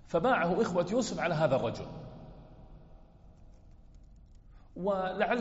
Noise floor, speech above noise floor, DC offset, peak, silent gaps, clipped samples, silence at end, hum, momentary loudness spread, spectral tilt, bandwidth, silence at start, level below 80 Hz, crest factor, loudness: -55 dBFS; 25 dB; under 0.1%; -16 dBFS; none; under 0.1%; 0 s; none; 21 LU; -5 dB/octave; 8 kHz; 0.05 s; -56 dBFS; 18 dB; -31 LUFS